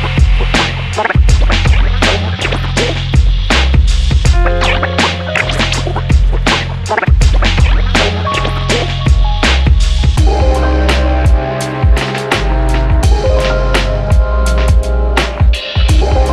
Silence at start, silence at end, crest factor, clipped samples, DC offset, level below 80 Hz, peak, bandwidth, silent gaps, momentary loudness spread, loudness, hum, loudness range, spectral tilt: 0 s; 0 s; 10 dB; under 0.1%; under 0.1%; -12 dBFS; 0 dBFS; 12 kHz; none; 3 LU; -12 LUFS; none; 1 LU; -5 dB/octave